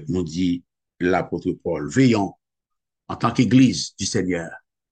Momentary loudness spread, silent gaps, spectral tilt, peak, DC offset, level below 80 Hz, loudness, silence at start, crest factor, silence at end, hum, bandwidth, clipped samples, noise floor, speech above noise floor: 12 LU; none; -5.5 dB/octave; -4 dBFS; under 0.1%; -52 dBFS; -21 LUFS; 0 s; 18 dB; 0.35 s; none; 9.4 kHz; under 0.1%; -83 dBFS; 63 dB